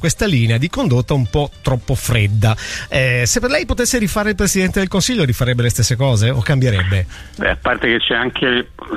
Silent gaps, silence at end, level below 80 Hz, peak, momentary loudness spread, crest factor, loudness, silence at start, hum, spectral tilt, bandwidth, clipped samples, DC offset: none; 0 s; -30 dBFS; 0 dBFS; 5 LU; 16 dB; -16 LUFS; 0 s; none; -4.5 dB/octave; 15.5 kHz; under 0.1%; under 0.1%